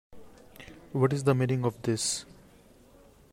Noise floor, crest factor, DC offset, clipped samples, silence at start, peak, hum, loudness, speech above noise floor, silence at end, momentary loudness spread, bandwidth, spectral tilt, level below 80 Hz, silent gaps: -57 dBFS; 18 dB; under 0.1%; under 0.1%; 0.1 s; -12 dBFS; none; -28 LUFS; 29 dB; 1.1 s; 23 LU; 16 kHz; -5 dB/octave; -62 dBFS; none